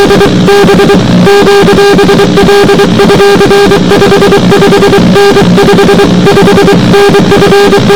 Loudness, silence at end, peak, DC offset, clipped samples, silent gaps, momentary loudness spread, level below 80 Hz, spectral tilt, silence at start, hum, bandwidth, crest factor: -3 LUFS; 0 s; 0 dBFS; under 0.1%; 20%; none; 1 LU; -24 dBFS; -5.5 dB/octave; 0 s; none; 20 kHz; 2 dB